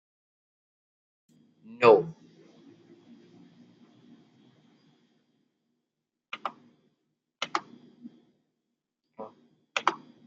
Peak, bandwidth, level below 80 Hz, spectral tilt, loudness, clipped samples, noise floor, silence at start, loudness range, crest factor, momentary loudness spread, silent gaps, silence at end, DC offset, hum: -6 dBFS; 7.8 kHz; -80 dBFS; -4.5 dB/octave; -27 LUFS; under 0.1%; -85 dBFS; 1.8 s; 18 LU; 28 dB; 31 LU; none; 0.3 s; under 0.1%; none